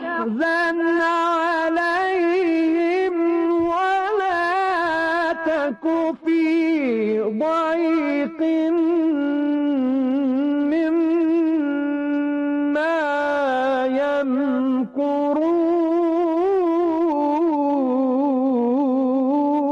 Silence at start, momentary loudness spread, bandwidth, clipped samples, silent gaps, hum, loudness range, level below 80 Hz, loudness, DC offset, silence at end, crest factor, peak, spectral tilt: 0 s; 3 LU; 7.8 kHz; under 0.1%; none; none; 1 LU; -60 dBFS; -20 LUFS; under 0.1%; 0 s; 6 dB; -12 dBFS; -6 dB/octave